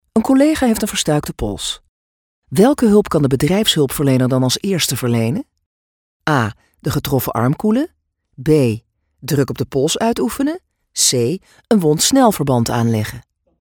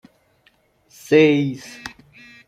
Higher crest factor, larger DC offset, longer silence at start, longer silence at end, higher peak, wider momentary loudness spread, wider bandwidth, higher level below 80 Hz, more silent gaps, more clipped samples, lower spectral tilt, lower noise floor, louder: about the same, 16 dB vs 20 dB; neither; second, 0.15 s vs 1.1 s; second, 0.4 s vs 0.6 s; about the same, 0 dBFS vs -2 dBFS; second, 11 LU vs 22 LU; first, 20 kHz vs 14.5 kHz; first, -42 dBFS vs -62 dBFS; first, 1.89-2.42 s, 5.66-6.20 s vs none; neither; about the same, -5 dB/octave vs -6 dB/octave; first, under -90 dBFS vs -60 dBFS; about the same, -16 LUFS vs -17 LUFS